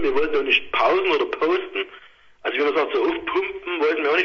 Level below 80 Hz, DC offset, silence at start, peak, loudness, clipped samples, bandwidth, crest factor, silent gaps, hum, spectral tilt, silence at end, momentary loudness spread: -56 dBFS; under 0.1%; 0 s; -4 dBFS; -21 LUFS; under 0.1%; 6.6 kHz; 18 dB; none; none; -4 dB/octave; 0 s; 9 LU